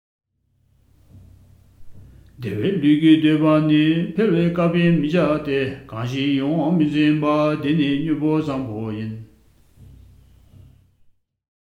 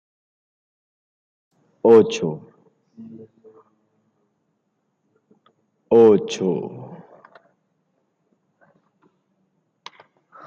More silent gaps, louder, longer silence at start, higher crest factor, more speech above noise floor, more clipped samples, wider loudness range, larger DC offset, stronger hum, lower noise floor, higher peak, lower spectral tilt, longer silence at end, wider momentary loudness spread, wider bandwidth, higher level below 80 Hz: neither; about the same, -19 LUFS vs -17 LUFS; second, 1.15 s vs 1.85 s; about the same, 18 dB vs 22 dB; second, 47 dB vs 56 dB; neither; about the same, 9 LU vs 10 LU; neither; neither; second, -65 dBFS vs -72 dBFS; about the same, -4 dBFS vs -2 dBFS; first, -8 dB/octave vs -6.5 dB/octave; second, 2.4 s vs 3.5 s; second, 12 LU vs 28 LU; second, 6.6 kHz vs 7.4 kHz; first, -52 dBFS vs -68 dBFS